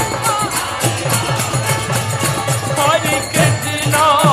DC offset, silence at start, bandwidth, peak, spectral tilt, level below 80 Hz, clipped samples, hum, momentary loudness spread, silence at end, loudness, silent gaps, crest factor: under 0.1%; 0 s; 15.5 kHz; 0 dBFS; -3.5 dB/octave; -44 dBFS; under 0.1%; none; 4 LU; 0 s; -15 LUFS; none; 16 dB